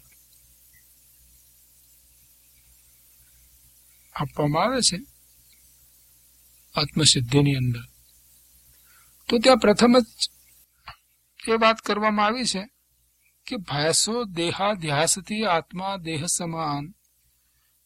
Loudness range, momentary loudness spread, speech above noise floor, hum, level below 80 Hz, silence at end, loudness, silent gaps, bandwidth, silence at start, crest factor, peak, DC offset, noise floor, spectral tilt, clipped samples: 6 LU; 16 LU; 43 dB; 60 Hz at -50 dBFS; -54 dBFS; 0.95 s; -22 LUFS; none; 16.5 kHz; 4.15 s; 24 dB; -2 dBFS; under 0.1%; -66 dBFS; -3.5 dB/octave; under 0.1%